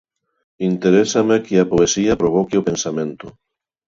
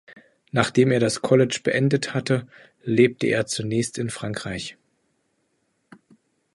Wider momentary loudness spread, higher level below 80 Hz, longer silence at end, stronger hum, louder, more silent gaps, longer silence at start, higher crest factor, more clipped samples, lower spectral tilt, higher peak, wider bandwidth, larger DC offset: about the same, 10 LU vs 11 LU; first, -48 dBFS vs -58 dBFS; second, 0.6 s vs 1.85 s; neither; first, -17 LUFS vs -22 LUFS; neither; first, 0.6 s vs 0.1 s; second, 16 dB vs 22 dB; neither; about the same, -5 dB/octave vs -5.5 dB/octave; about the same, -2 dBFS vs -2 dBFS; second, 7.8 kHz vs 11.5 kHz; neither